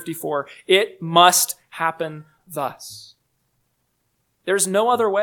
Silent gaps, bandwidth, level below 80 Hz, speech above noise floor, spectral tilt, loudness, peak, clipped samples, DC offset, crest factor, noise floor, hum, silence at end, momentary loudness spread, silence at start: none; 19 kHz; -74 dBFS; 50 dB; -2.5 dB/octave; -19 LUFS; 0 dBFS; under 0.1%; under 0.1%; 22 dB; -70 dBFS; none; 0 s; 21 LU; 0 s